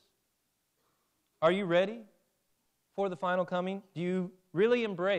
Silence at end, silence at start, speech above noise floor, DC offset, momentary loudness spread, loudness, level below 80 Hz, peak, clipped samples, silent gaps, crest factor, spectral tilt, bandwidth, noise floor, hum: 0 s; 1.4 s; 49 dB; under 0.1%; 9 LU; -31 LUFS; -82 dBFS; -14 dBFS; under 0.1%; none; 18 dB; -7 dB/octave; 9.4 kHz; -79 dBFS; none